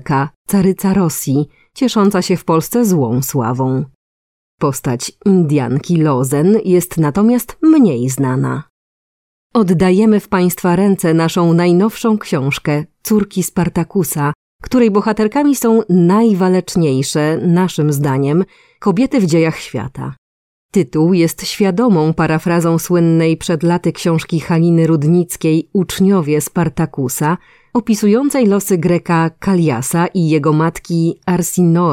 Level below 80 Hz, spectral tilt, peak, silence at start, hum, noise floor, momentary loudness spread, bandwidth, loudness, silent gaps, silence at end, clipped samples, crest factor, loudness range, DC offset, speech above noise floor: -46 dBFS; -6.5 dB/octave; 0 dBFS; 0.05 s; none; under -90 dBFS; 6 LU; 16.5 kHz; -14 LUFS; 0.36-0.45 s, 3.95-4.58 s, 8.70-9.50 s, 14.35-14.59 s, 20.18-20.69 s; 0 s; under 0.1%; 12 dB; 3 LU; under 0.1%; over 77 dB